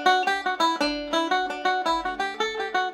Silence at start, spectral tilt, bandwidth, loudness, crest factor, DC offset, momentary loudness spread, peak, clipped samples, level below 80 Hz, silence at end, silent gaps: 0 s; -1.5 dB/octave; 15.5 kHz; -25 LUFS; 18 dB; under 0.1%; 4 LU; -6 dBFS; under 0.1%; -54 dBFS; 0 s; none